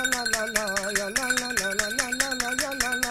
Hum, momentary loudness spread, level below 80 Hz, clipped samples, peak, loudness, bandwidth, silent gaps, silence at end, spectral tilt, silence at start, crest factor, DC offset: none; 2 LU; -48 dBFS; under 0.1%; -4 dBFS; -25 LUFS; 16 kHz; none; 0 s; -0.5 dB/octave; 0 s; 22 dB; under 0.1%